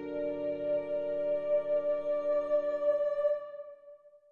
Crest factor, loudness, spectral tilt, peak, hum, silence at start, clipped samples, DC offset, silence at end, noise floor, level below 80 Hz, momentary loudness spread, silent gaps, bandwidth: 12 dB; -32 LUFS; -7.5 dB/octave; -20 dBFS; none; 0 s; under 0.1%; under 0.1%; 0.15 s; -55 dBFS; -70 dBFS; 6 LU; none; 4.4 kHz